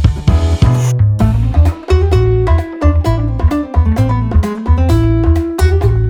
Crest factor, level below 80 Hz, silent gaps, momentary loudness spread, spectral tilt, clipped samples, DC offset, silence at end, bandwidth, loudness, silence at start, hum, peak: 10 dB; -16 dBFS; none; 3 LU; -8 dB/octave; under 0.1%; under 0.1%; 0 s; 12.5 kHz; -13 LUFS; 0 s; none; 0 dBFS